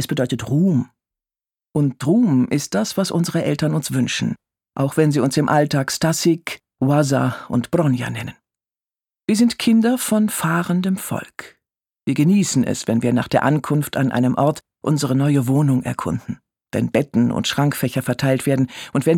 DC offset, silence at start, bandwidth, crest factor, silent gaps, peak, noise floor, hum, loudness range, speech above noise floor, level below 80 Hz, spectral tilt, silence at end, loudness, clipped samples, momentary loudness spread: under 0.1%; 0 s; 18 kHz; 18 dB; none; -2 dBFS; under -90 dBFS; none; 2 LU; over 72 dB; -54 dBFS; -6 dB/octave; 0 s; -19 LUFS; under 0.1%; 10 LU